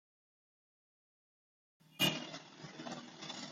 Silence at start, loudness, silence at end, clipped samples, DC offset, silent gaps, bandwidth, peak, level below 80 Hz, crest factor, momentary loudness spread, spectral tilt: 1.9 s; -39 LUFS; 0 s; under 0.1%; under 0.1%; none; 16 kHz; -18 dBFS; -82 dBFS; 26 dB; 16 LU; -3 dB/octave